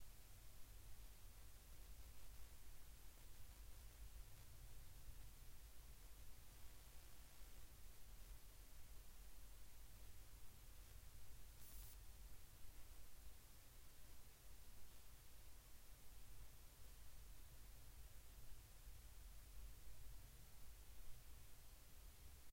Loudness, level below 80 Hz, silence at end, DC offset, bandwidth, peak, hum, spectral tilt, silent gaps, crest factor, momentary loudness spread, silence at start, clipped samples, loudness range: -65 LUFS; -62 dBFS; 0 s; under 0.1%; 16 kHz; -42 dBFS; none; -3 dB/octave; none; 14 dB; 3 LU; 0 s; under 0.1%; 2 LU